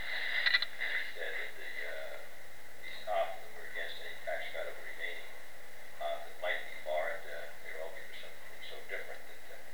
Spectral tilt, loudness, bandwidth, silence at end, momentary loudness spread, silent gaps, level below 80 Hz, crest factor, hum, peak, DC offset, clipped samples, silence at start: -1.5 dB/octave; -38 LUFS; over 20 kHz; 0 s; 17 LU; none; -72 dBFS; 26 dB; 60 Hz at -70 dBFS; -14 dBFS; 1%; under 0.1%; 0 s